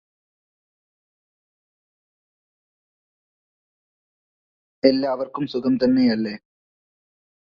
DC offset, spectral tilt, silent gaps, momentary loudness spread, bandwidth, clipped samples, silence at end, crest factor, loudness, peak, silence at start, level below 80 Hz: under 0.1%; -8 dB/octave; none; 9 LU; 5.6 kHz; under 0.1%; 1.1 s; 26 dB; -21 LUFS; -2 dBFS; 4.85 s; -64 dBFS